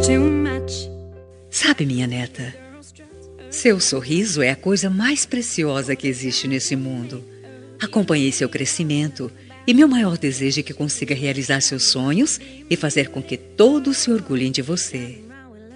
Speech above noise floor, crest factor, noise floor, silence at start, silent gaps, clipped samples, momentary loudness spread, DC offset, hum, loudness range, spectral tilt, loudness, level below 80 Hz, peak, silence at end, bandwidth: 23 dB; 20 dB; -43 dBFS; 0 s; none; under 0.1%; 14 LU; under 0.1%; none; 4 LU; -4 dB/octave; -20 LUFS; -54 dBFS; 0 dBFS; 0 s; 11 kHz